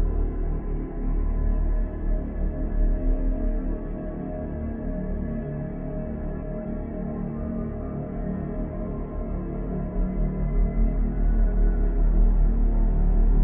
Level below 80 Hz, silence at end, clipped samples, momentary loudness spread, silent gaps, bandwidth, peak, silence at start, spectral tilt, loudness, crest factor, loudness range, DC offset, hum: -24 dBFS; 0 s; under 0.1%; 7 LU; none; 2.4 kHz; -10 dBFS; 0 s; -13.5 dB/octave; -29 LUFS; 14 dB; 6 LU; under 0.1%; none